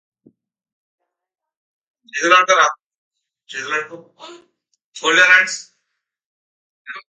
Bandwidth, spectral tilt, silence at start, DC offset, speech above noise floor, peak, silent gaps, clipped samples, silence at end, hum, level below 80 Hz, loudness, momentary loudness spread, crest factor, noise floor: 9.6 kHz; -0.5 dB/octave; 2.15 s; under 0.1%; 60 dB; 0 dBFS; 2.86-2.91 s, 2.97-3.11 s, 4.84-4.92 s, 6.25-6.85 s; under 0.1%; 0.1 s; none; -80 dBFS; -14 LUFS; 24 LU; 20 dB; -76 dBFS